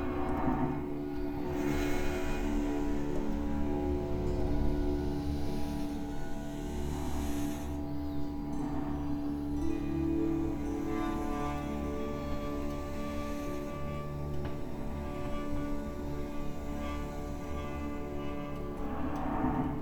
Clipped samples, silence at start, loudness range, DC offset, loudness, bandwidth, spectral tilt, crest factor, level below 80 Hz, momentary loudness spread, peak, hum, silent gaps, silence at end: under 0.1%; 0 s; 5 LU; under 0.1%; -36 LUFS; 18.5 kHz; -7 dB/octave; 14 dB; -40 dBFS; 7 LU; -18 dBFS; none; none; 0 s